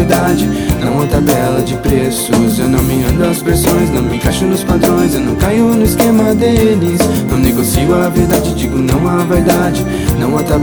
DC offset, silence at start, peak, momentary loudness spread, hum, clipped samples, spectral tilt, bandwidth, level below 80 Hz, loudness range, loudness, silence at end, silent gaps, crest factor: under 0.1%; 0 s; 0 dBFS; 4 LU; none; under 0.1%; -6 dB/octave; over 20 kHz; -24 dBFS; 1 LU; -12 LUFS; 0 s; none; 10 dB